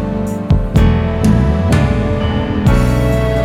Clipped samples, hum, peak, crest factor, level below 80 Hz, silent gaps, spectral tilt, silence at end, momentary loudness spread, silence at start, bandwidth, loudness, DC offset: under 0.1%; none; 0 dBFS; 12 dB; -18 dBFS; none; -7.5 dB/octave; 0 s; 4 LU; 0 s; 15.5 kHz; -14 LUFS; under 0.1%